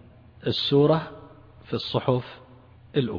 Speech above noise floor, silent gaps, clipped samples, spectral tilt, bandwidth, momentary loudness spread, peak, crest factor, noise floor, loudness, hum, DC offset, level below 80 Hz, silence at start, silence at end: 27 dB; none; under 0.1%; -8 dB/octave; 5.4 kHz; 13 LU; -8 dBFS; 18 dB; -51 dBFS; -25 LUFS; none; under 0.1%; -58 dBFS; 0.45 s; 0 s